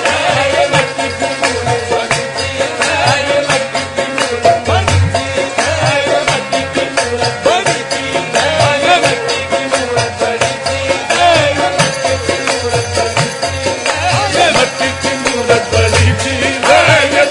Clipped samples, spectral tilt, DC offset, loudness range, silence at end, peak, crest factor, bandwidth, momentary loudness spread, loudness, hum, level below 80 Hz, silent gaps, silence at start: under 0.1%; -3.5 dB/octave; under 0.1%; 1 LU; 0 s; 0 dBFS; 12 dB; 11 kHz; 6 LU; -12 LUFS; none; -44 dBFS; none; 0 s